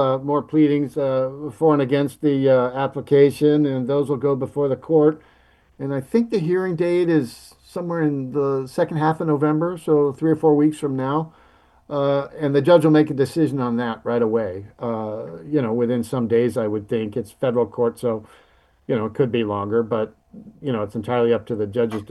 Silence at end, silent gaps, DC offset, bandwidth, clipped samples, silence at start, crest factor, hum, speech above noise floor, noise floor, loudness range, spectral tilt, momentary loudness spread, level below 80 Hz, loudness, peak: 0.05 s; none; under 0.1%; 12.5 kHz; under 0.1%; 0 s; 18 dB; none; 31 dB; -51 dBFS; 5 LU; -8 dB/octave; 10 LU; -60 dBFS; -21 LUFS; -2 dBFS